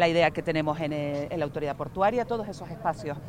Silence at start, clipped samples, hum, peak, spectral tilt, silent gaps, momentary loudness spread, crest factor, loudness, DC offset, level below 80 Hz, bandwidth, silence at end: 0 s; under 0.1%; none; -8 dBFS; -6.5 dB/octave; none; 8 LU; 20 dB; -28 LUFS; under 0.1%; -52 dBFS; 16 kHz; 0 s